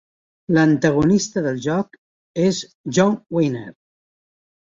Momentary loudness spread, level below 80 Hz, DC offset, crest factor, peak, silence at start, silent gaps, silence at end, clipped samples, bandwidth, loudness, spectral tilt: 15 LU; -52 dBFS; under 0.1%; 18 dB; -2 dBFS; 0.5 s; 1.98-2.34 s, 2.75-2.84 s; 1 s; under 0.1%; 7.8 kHz; -19 LUFS; -6 dB/octave